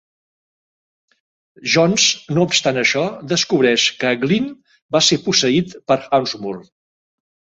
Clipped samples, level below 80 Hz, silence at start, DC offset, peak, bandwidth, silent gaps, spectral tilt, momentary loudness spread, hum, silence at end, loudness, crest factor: under 0.1%; -60 dBFS; 1.6 s; under 0.1%; 0 dBFS; 8 kHz; 4.82-4.89 s; -3.5 dB/octave; 10 LU; none; 0.95 s; -16 LUFS; 18 dB